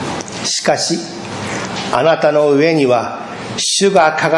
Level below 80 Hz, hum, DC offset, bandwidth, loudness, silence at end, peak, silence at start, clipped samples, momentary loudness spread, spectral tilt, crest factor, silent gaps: -54 dBFS; none; under 0.1%; 11.5 kHz; -14 LUFS; 0 s; 0 dBFS; 0 s; under 0.1%; 12 LU; -3.5 dB/octave; 14 dB; none